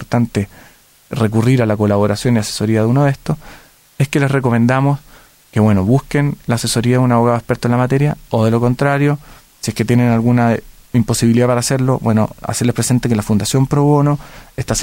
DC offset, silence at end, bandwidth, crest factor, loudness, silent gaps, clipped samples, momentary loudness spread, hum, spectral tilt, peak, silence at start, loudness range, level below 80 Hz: under 0.1%; 0 s; 16.5 kHz; 12 dB; -15 LUFS; none; under 0.1%; 9 LU; none; -6 dB/octave; -2 dBFS; 0 s; 1 LU; -40 dBFS